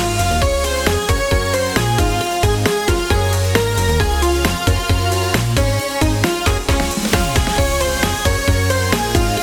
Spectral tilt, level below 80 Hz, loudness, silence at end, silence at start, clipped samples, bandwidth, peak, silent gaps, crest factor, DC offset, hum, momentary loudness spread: -4.5 dB/octave; -22 dBFS; -17 LUFS; 0 s; 0 s; under 0.1%; 19 kHz; -2 dBFS; none; 14 dB; under 0.1%; none; 1 LU